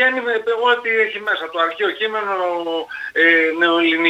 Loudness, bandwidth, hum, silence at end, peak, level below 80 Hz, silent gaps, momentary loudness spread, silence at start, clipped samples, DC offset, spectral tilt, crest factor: -17 LUFS; 8.8 kHz; none; 0 s; -2 dBFS; -70 dBFS; none; 9 LU; 0 s; under 0.1%; under 0.1%; -4 dB/octave; 16 dB